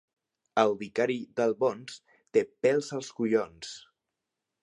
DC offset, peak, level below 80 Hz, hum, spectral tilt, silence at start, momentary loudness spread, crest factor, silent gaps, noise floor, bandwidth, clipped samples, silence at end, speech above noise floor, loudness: under 0.1%; -8 dBFS; -74 dBFS; none; -5 dB/octave; 0.55 s; 16 LU; 22 dB; none; -86 dBFS; 11 kHz; under 0.1%; 0.85 s; 58 dB; -29 LUFS